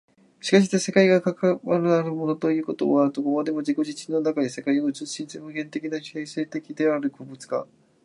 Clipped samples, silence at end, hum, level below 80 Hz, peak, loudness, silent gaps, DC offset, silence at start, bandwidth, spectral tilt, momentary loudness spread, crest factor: under 0.1%; 0.4 s; none; -74 dBFS; -4 dBFS; -24 LUFS; none; under 0.1%; 0.45 s; 11.5 kHz; -5.5 dB/octave; 13 LU; 20 dB